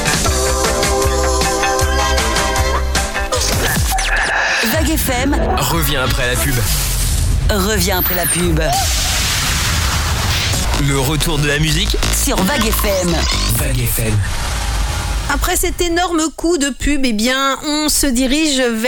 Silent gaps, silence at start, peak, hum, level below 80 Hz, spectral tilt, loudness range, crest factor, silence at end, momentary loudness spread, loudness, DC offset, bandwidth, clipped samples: none; 0 s; -4 dBFS; none; -20 dBFS; -3.5 dB/octave; 2 LU; 12 dB; 0 s; 3 LU; -15 LUFS; under 0.1%; 19 kHz; under 0.1%